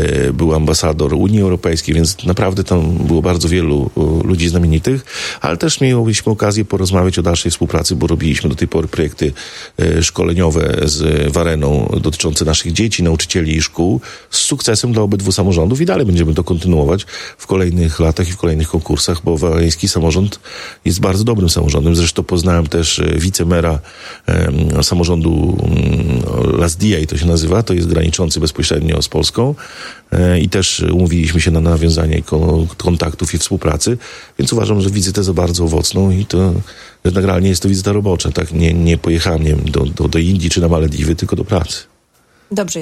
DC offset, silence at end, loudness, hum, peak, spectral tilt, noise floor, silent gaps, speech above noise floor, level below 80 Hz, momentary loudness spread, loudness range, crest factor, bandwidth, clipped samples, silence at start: under 0.1%; 0 s; -14 LUFS; none; 0 dBFS; -5 dB/octave; -53 dBFS; none; 40 dB; -24 dBFS; 5 LU; 1 LU; 14 dB; 14.5 kHz; under 0.1%; 0 s